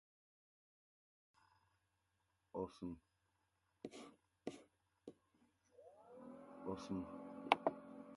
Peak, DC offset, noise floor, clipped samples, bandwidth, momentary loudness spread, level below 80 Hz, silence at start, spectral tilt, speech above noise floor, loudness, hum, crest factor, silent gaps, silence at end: -14 dBFS; under 0.1%; -85 dBFS; under 0.1%; 11.5 kHz; 24 LU; -76 dBFS; 2.55 s; -5.5 dB/octave; 37 dB; -46 LUFS; none; 36 dB; none; 0 s